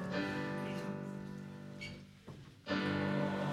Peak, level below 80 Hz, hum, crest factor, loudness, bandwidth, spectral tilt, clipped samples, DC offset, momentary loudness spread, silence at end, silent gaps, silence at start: -24 dBFS; -68 dBFS; none; 16 dB; -40 LUFS; 13 kHz; -6.5 dB/octave; under 0.1%; under 0.1%; 17 LU; 0 s; none; 0 s